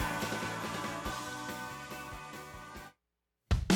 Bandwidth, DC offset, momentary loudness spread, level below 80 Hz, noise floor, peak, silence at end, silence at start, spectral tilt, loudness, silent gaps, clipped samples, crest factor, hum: 19 kHz; under 0.1%; 12 LU; -44 dBFS; -86 dBFS; -14 dBFS; 0 s; 0 s; -4.5 dB/octave; -39 LUFS; none; under 0.1%; 24 dB; none